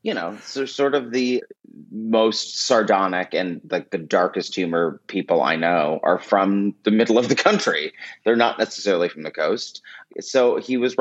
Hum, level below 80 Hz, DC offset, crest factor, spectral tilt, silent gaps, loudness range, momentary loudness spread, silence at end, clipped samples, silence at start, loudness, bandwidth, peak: none; -76 dBFS; under 0.1%; 20 dB; -4.5 dB/octave; none; 2 LU; 10 LU; 0.05 s; under 0.1%; 0.05 s; -21 LUFS; 8.2 kHz; -2 dBFS